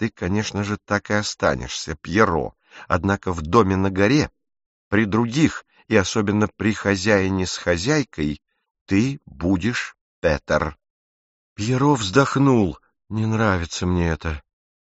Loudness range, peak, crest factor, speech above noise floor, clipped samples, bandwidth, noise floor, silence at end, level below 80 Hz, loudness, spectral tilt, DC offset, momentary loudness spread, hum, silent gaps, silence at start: 3 LU; -2 dBFS; 20 dB; over 70 dB; under 0.1%; 8 kHz; under -90 dBFS; 0.4 s; -42 dBFS; -21 LUFS; -5 dB/octave; under 0.1%; 10 LU; none; 4.66-4.91 s, 8.71-8.75 s, 8.81-8.86 s, 10.01-10.22 s, 10.90-11.56 s; 0 s